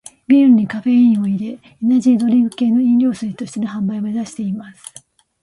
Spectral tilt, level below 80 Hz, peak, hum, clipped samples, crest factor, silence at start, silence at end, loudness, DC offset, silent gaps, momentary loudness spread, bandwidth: -7 dB/octave; -60 dBFS; -2 dBFS; none; under 0.1%; 14 dB; 0.3 s; 0.7 s; -16 LUFS; under 0.1%; none; 13 LU; 11.5 kHz